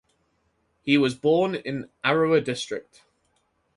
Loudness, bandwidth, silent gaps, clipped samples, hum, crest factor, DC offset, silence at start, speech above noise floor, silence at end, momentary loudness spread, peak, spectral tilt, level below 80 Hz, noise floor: -24 LUFS; 11.5 kHz; none; under 0.1%; none; 20 dB; under 0.1%; 0.85 s; 47 dB; 0.95 s; 12 LU; -6 dBFS; -5.5 dB/octave; -64 dBFS; -70 dBFS